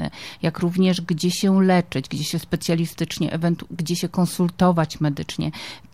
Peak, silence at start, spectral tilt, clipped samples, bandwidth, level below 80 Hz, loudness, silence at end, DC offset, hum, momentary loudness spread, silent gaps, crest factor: -6 dBFS; 0 s; -6 dB/octave; under 0.1%; 15.5 kHz; -50 dBFS; -22 LUFS; 0.15 s; 0.3%; none; 8 LU; none; 16 dB